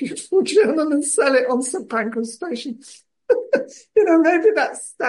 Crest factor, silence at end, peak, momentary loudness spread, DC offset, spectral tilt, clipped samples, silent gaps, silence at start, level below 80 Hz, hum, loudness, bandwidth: 14 dB; 0 s; -4 dBFS; 12 LU; under 0.1%; -3 dB/octave; under 0.1%; none; 0 s; -72 dBFS; none; -19 LUFS; 11.5 kHz